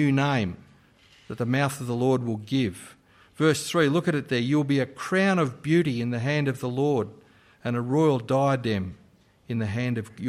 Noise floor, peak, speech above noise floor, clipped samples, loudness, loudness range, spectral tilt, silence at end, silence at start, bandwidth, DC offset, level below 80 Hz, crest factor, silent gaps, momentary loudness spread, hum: -57 dBFS; -10 dBFS; 32 dB; under 0.1%; -25 LUFS; 3 LU; -6.5 dB/octave; 0 s; 0 s; 15.5 kHz; under 0.1%; -62 dBFS; 16 dB; none; 9 LU; none